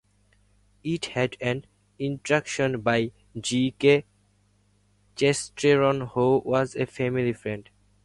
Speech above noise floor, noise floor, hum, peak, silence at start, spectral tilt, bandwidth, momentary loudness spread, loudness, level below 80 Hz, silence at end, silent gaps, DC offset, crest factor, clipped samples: 40 dB; -64 dBFS; 50 Hz at -55 dBFS; -6 dBFS; 0.85 s; -5 dB/octave; 11.5 kHz; 12 LU; -25 LUFS; -58 dBFS; 0.45 s; none; under 0.1%; 20 dB; under 0.1%